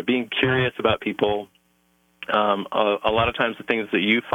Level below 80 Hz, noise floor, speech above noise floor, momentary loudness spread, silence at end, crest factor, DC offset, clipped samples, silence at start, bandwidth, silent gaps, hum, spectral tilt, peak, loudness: -50 dBFS; -64 dBFS; 42 dB; 5 LU; 0 s; 16 dB; under 0.1%; under 0.1%; 0 s; 17.5 kHz; none; none; -7 dB/octave; -6 dBFS; -22 LUFS